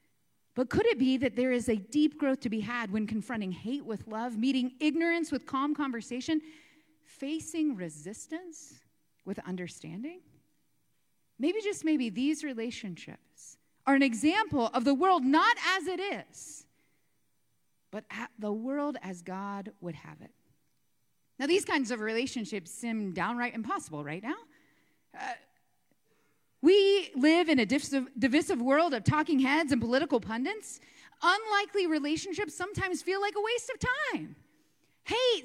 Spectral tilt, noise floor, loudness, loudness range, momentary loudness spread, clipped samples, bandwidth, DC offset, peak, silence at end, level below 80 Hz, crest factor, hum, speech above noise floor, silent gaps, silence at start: -4.5 dB/octave; -78 dBFS; -30 LUFS; 12 LU; 16 LU; under 0.1%; 13.5 kHz; under 0.1%; -12 dBFS; 0 s; -64 dBFS; 20 dB; none; 48 dB; none; 0.55 s